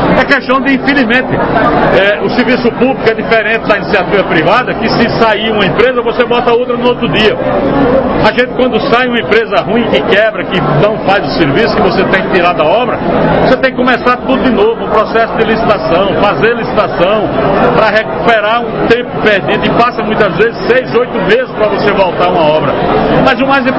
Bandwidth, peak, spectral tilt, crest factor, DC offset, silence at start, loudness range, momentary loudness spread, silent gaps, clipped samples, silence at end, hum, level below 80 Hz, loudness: 8 kHz; 0 dBFS; -7 dB/octave; 10 dB; 0.6%; 0 s; 1 LU; 3 LU; none; 0.7%; 0 s; none; -32 dBFS; -9 LUFS